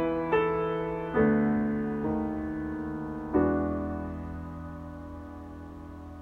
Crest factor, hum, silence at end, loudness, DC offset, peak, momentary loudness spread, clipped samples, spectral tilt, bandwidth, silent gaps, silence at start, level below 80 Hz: 18 dB; none; 0 s; -29 LUFS; under 0.1%; -12 dBFS; 17 LU; under 0.1%; -9.5 dB/octave; 4.6 kHz; none; 0 s; -48 dBFS